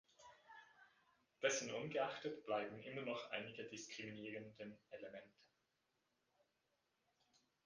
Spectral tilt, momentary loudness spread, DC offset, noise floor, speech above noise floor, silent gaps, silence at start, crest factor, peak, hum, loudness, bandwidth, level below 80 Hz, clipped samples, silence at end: -3 dB/octave; 21 LU; under 0.1%; -87 dBFS; 39 dB; none; 0.2 s; 24 dB; -26 dBFS; none; -47 LUFS; 9.6 kHz; -88 dBFS; under 0.1%; 2.4 s